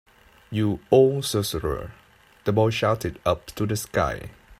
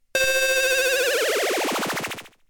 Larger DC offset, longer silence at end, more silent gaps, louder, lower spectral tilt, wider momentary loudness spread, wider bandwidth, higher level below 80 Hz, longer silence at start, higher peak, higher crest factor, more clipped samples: neither; second, 0.05 s vs 0.2 s; neither; second, -24 LUFS vs -21 LUFS; first, -5.5 dB/octave vs -0.5 dB/octave; first, 13 LU vs 8 LU; second, 16 kHz vs 19 kHz; first, -46 dBFS vs -54 dBFS; first, 0.5 s vs 0.15 s; about the same, -4 dBFS vs -6 dBFS; about the same, 20 dB vs 16 dB; neither